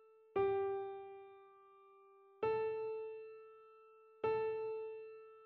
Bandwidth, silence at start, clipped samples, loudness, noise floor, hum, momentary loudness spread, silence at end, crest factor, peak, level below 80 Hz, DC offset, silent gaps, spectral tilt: 4.3 kHz; 0 s; under 0.1%; -41 LUFS; -65 dBFS; none; 22 LU; 0 s; 16 dB; -26 dBFS; -78 dBFS; under 0.1%; none; -5 dB/octave